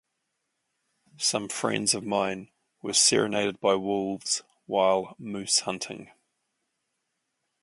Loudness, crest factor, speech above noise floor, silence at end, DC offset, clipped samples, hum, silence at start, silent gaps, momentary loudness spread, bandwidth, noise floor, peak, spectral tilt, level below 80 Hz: -26 LUFS; 20 dB; 53 dB; 1.6 s; under 0.1%; under 0.1%; none; 1.2 s; none; 15 LU; 11.5 kHz; -80 dBFS; -8 dBFS; -2 dB/octave; -70 dBFS